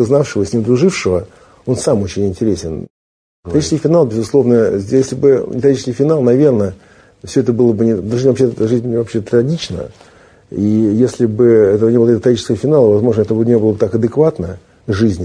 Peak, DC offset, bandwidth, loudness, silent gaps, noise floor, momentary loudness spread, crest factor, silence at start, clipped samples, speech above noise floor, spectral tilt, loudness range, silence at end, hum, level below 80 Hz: 0 dBFS; under 0.1%; 10.5 kHz; -13 LUFS; 2.90-3.43 s; under -90 dBFS; 10 LU; 14 dB; 0 s; under 0.1%; over 77 dB; -7 dB/octave; 4 LU; 0 s; none; -44 dBFS